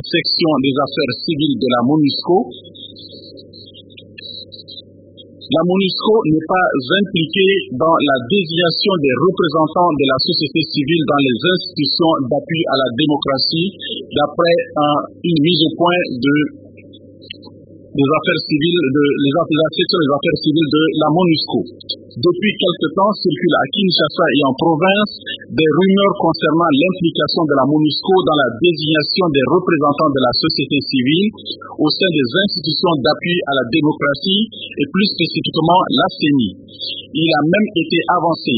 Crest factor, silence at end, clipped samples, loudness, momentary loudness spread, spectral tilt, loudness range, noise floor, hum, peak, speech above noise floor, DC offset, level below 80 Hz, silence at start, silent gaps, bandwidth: 14 dB; 0 s; under 0.1%; -15 LUFS; 8 LU; -11.5 dB/octave; 4 LU; -41 dBFS; none; 0 dBFS; 26 dB; under 0.1%; -54 dBFS; 0.05 s; none; 5 kHz